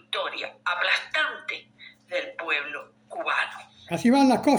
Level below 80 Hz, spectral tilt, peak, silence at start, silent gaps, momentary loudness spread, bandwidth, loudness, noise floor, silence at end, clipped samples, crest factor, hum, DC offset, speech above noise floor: -74 dBFS; -4 dB/octave; -8 dBFS; 0.1 s; none; 16 LU; over 20 kHz; -26 LUFS; -51 dBFS; 0 s; under 0.1%; 18 dB; none; under 0.1%; 29 dB